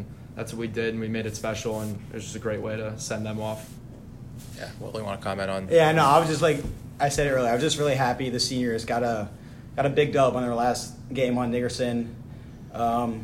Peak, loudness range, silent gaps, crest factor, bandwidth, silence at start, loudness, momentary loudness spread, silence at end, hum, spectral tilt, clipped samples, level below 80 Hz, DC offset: -4 dBFS; 10 LU; none; 22 dB; 16 kHz; 0 s; -25 LUFS; 18 LU; 0 s; none; -5 dB/octave; under 0.1%; -48 dBFS; under 0.1%